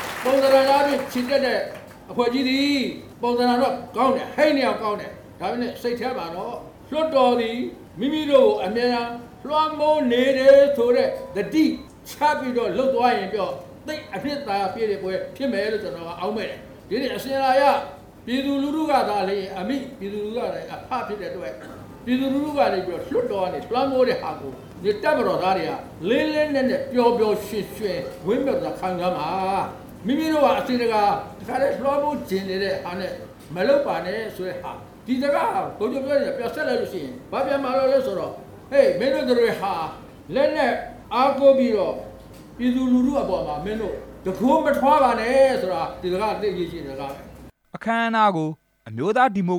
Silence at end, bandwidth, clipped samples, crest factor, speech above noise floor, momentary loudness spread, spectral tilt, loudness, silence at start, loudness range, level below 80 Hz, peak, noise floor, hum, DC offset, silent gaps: 0 s; 18 kHz; under 0.1%; 18 dB; 21 dB; 14 LU; -5.5 dB/octave; -22 LUFS; 0 s; 6 LU; -52 dBFS; -4 dBFS; -42 dBFS; none; under 0.1%; none